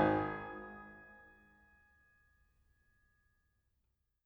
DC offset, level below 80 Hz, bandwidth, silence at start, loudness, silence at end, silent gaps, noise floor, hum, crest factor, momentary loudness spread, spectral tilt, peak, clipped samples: under 0.1%; -66 dBFS; 5.6 kHz; 0 s; -40 LUFS; 3 s; none; -82 dBFS; none; 24 dB; 25 LU; -9 dB/octave; -18 dBFS; under 0.1%